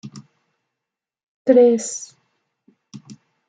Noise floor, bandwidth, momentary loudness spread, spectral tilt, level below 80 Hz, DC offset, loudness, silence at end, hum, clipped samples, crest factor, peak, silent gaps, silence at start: -85 dBFS; 9.4 kHz; 26 LU; -5 dB/octave; -74 dBFS; under 0.1%; -16 LUFS; 0.35 s; none; under 0.1%; 20 dB; -2 dBFS; 1.23-1.45 s; 0.05 s